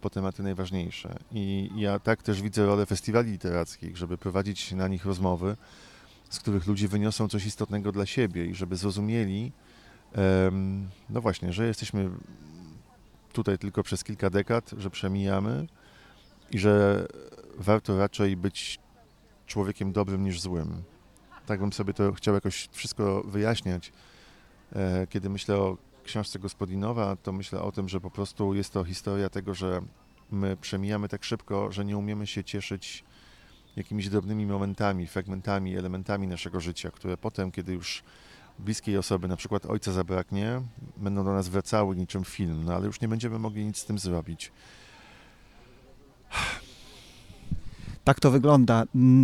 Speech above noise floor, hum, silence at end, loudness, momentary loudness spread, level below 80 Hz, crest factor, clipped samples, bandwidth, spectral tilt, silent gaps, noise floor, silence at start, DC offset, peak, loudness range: 30 dB; none; 0 s; -29 LUFS; 12 LU; -52 dBFS; 24 dB; under 0.1%; 13 kHz; -6.5 dB/octave; none; -58 dBFS; 0 s; under 0.1%; -6 dBFS; 5 LU